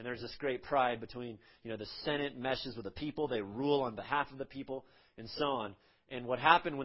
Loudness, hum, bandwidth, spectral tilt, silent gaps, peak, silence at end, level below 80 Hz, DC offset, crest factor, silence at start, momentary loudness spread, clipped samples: -36 LUFS; none; 5.8 kHz; -8.5 dB/octave; none; -10 dBFS; 0 s; -64 dBFS; under 0.1%; 26 dB; 0 s; 14 LU; under 0.1%